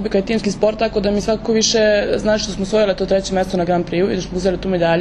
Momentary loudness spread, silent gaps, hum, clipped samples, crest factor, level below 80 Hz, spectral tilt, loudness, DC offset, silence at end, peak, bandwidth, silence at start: 5 LU; none; none; under 0.1%; 16 dB; -36 dBFS; -4.5 dB/octave; -17 LUFS; under 0.1%; 0 s; -2 dBFS; 10.5 kHz; 0 s